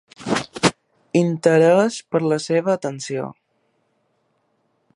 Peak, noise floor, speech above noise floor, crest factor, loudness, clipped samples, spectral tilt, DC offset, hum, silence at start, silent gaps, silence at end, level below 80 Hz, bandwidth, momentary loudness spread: -2 dBFS; -67 dBFS; 49 dB; 20 dB; -20 LUFS; under 0.1%; -5.5 dB/octave; under 0.1%; none; 0.2 s; none; 1.65 s; -60 dBFS; 11.5 kHz; 12 LU